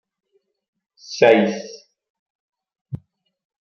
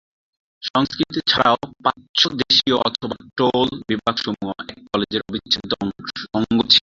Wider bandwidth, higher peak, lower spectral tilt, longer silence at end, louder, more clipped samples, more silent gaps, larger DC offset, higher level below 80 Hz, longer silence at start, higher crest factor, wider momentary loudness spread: about the same, 7.2 kHz vs 7.8 kHz; about the same, -2 dBFS vs -2 dBFS; about the same, -5.5 dB/octave vs -4.5 dB/octave; first, 0.65 s vs 0.05 s; first, -16 LUFS vs -20 LUFS; neither; first, 2.10-2.49 s, 2.81-2.85 s vs 0.70-0.74 s, 2.09-2.14 s; neither; second, -66 dBFS vs -52 dBFS; first, 1.1 s vs 0.6 s; about the same, 22 dB vs 20 dB; first, 22 LU vs 12 LU